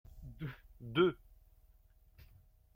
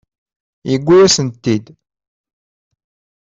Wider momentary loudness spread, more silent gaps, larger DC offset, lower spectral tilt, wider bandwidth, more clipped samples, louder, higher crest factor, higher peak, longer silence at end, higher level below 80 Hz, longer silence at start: first, 22 LU vs 12 LU; neither; neither; first, -8 dB/octave vs -4.5 dB/octave; first, 16 kHz vs 7.8 kHz; neither; second, -36 LUFS vs -13 LUFS; first, 22 dB vs 16 dB; second, -18 dBFS vs -2 dBFS; about the same, 1.6 s vs 1.6 s; second, -60 dBFS vs -52 dBFS; second, 0.15 s vs 0.65 s